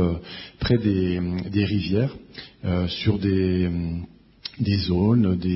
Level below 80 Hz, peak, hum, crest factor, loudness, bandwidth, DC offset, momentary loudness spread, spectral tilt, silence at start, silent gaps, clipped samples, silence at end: -42 dBFS; -6 dBFS; none; 16 dB; -23 LUFS; 5.8 kHz; under 0.1%; 16 LU; -11 dB/octave; 0 s; none; under 0.1%; 0 s